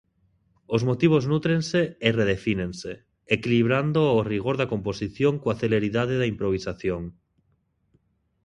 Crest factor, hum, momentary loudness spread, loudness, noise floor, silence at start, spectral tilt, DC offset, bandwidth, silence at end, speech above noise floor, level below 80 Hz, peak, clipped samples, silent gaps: 22 dB; none; 9 LU; -24 LUFS; -69 dBFS; 0.7 s; -7 dB/octave; under 0.1%; 10.5 kHz; 1.35 s; 46 dB; -50 dBFS; -4 dBFS; under 0.1%; none